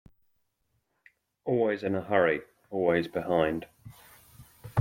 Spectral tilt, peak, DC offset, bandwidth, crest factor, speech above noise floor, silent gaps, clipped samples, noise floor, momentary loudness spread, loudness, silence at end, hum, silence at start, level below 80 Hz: -7.5 dB/octave; -10 dBFS; under 0.1%; 16.5 kHz; 20 dB; 49 dB; none; under 0.1%; -76 dBFS; 13 LU; -29 LUFS; 0 s; none; 1.45 s; -62 dBFS